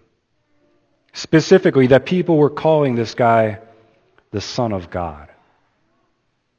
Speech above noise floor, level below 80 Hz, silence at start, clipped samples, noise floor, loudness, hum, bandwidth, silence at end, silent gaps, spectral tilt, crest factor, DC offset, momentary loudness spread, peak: 52 dB; -50 dBFS; 1.15 s; under 0.1%; -67 dBFS; -16 LUFS; none; 8 kHz; 1.35 s; none; -6.5 dB/octave; 18 dB; under 0.1%; 17 LU; 0 dBFS